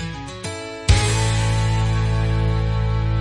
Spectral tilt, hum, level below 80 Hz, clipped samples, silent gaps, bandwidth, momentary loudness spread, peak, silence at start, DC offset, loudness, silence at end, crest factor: -5 dB/octave; none; -26 dBFS; under 0.1%; none; 11.5 kHz; 12 LU; -4 dBFS; 0 s; under 0.1%; -21 LUFS; 0 s; 16 dB